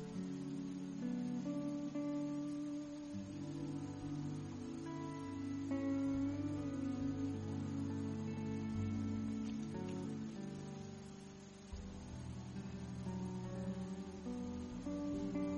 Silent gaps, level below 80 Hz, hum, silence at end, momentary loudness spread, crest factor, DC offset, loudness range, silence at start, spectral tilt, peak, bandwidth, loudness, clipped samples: none; -62 dBFS; none; 0 s; 8 LU; 14 dB; under 0.1%; 6 LU; 0 s; -7.5 dB/octave; -30 dBFS; 10.5 kHz; -44 LUFS; under 0.1%